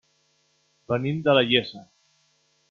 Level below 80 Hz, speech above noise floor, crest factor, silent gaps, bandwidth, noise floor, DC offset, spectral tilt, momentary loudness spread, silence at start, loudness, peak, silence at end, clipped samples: -64 dBFS; 45 dB; 22 dB; none; 7 kHz; -67 dBFS; under 0.1%; -7 dB/octave; 10 LU; 0.9 s; -22 LUFS; -6 dBFS; 0.85 s; under 0.1%